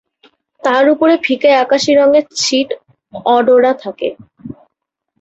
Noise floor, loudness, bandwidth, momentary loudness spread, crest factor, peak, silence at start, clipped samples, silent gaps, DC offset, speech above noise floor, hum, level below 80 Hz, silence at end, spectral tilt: -74 dBFS; -12 LUFS; 8.2 kHz; 17 LU; 12 dB; -2 dBFS; 0.65 s; under 0.1%; none; under 0.1%; 63 dB; none; -58 dBFS; 0.7 s; -3 dB/octave